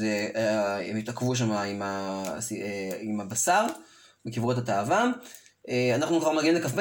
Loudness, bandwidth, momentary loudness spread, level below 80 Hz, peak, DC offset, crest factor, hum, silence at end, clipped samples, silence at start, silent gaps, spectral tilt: -27 LUFS; 17 kHz; 9 LU; -68 dBFS; -10 dBFS; under 0.1%; 16 dB; none; 0 s; under 0.1%; 0 s; none; -4.5 dB/octave